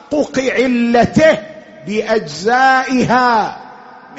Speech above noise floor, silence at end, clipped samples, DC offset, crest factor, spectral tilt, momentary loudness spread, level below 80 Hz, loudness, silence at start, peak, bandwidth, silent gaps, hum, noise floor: 24 dB; 0 s; under 0.1%; under 0.1%; 14 dB; -3.5 dB/octave; 12 LU; -46 dBFS; -14 LUFS; 0.1 s; 0 dBFS; 8 kHz; none; none; -37 dBFS